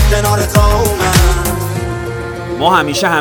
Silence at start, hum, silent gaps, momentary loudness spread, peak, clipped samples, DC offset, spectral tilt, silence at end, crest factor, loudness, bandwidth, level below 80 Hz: 0 s; none; none; 10 LU; 0 dBFS; under 0.1%; under 0.1%; -4.5 dB/octave; 0 s; 12 dB; -13 LUFS; 20 kHz; -18 dBFS